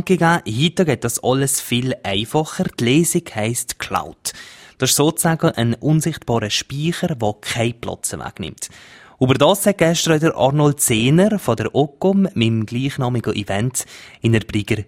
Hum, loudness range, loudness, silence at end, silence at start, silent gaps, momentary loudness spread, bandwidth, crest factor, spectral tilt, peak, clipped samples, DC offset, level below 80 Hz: none; 4 LU; -18 LUFS; 0.05 s; 0 s; none; 10 LU; 16 kHz; 18 dB; -4.5 dB/octave; 0 dBFS; under 0.1%; under 0.1%; -48 dBFS